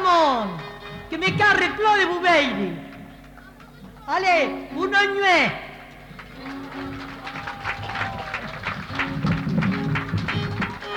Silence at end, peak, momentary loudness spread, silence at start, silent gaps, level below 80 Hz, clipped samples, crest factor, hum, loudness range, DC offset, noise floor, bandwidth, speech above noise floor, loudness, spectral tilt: 0 s; -8 dBFS; 20 LU; 0 s; none; -48 dBFS; under 0.1%; 16 dB; none; 8 LU; under 0.1%; -44 dBFS; 19 kHz; 25 dB; -22 LUFS; -5 dB/octave